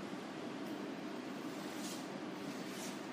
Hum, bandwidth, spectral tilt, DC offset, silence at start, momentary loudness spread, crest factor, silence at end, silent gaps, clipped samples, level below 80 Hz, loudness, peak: none; 15.5 kHz; -4 dB/octave; under 0.1%; 0 s; 2 LU; 14 dB; 0 s; none; under 0.1%; -86 dBFS; -45 LUFS; -32 dBFS